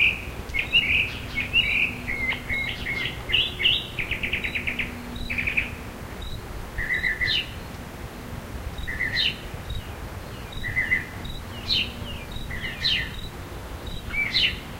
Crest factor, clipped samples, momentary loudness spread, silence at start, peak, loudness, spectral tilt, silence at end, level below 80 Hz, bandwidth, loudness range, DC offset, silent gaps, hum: 20 dB; under 0.1%; 16 LU; 0 s; -8 dBFS; -25 LUFS; -3.5 dB/octave; 0 s; -38 dBFS; 16 kHz; 6 LU; under 0.1%; none; none